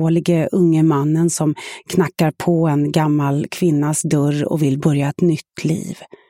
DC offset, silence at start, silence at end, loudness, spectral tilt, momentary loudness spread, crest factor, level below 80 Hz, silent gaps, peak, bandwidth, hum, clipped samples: under 0.1%; 0 s; 0.25 s; -17 LUFS; -6.5 dB/octave; 6 LU; 14 dB; -56 dBFS; none; -4 dBFS; 16.5 kHz; none; under 0.1%